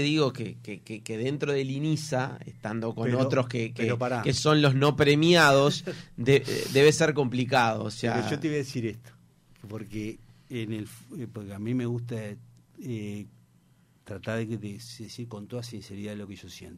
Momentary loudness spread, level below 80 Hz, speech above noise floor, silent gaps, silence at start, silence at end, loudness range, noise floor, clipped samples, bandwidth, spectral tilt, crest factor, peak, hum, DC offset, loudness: 19 LU; -60 dBFS; 35 dB; none; 0 s; 0 s; 15 LU; -62 dBFS; under 0.1%; 16 kHz; -5.5 dB/octave; 20 dB; -8 dBFS; none; under 0.1%; -26 LUFS